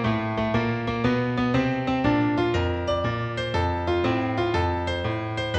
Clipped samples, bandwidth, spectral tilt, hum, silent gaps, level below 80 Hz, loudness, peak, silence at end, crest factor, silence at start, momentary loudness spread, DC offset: under 0.1%; 8.4 kHz; -7 dB/octave; none; none; -44 dBFS; -25 LUFS; -8 dBFS; 0 s; 16 dB; 0 s; 4 LU; under 0.1%